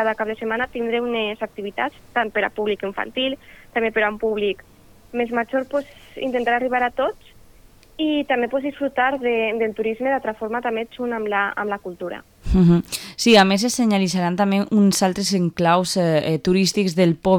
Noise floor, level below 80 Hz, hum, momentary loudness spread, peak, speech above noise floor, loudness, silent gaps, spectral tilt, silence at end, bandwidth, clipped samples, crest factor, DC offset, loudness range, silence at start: -49 dBFS; -42 dBFS; none; 10 LU; -4 dBFS; 28 dB; -21 LUFS; none; -5 dB/octave; 0 s; 18 kHz; under 0.1%; 18 dB; under 0.1%; 6 LU; 0 s